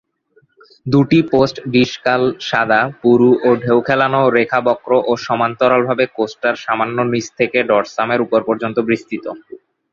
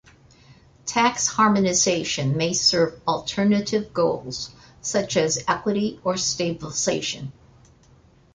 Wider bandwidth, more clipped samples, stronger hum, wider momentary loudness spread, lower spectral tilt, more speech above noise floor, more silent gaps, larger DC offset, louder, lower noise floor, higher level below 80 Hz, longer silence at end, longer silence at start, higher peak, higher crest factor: second, 7.2 kHz vs 9.6 kHz; neither; neither; second, 6 LU vs 11 LU; first, -6.5 dB/octave vs -3.5 dB/octave; first, 42 dB vs 32 dB; neither; neither; first, -15 LUFS vs -22 LUFS; about the same, -57 dBFS vs -54 dBFS; about the same, -54 dBFS vs -56 dBFS; second, 0.35 s vs 1.05 s; about the same, 0.85 s vs 0.85 s; first, -2 dBFS vs -6 dBFS; about the same, 14 dB vs 18 dB